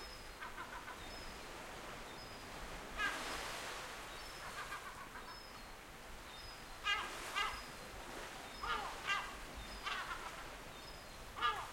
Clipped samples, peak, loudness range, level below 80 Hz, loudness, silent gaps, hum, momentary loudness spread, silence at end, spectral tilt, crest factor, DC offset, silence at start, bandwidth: under 0.1%; -24 dBFS; 5 LU; -58 dBFS; -45 LUFS; none; none; 12 LU; 0 s; -2 dB/octave; 22 dB; under 0.1%; 0 s; 16.5 kHz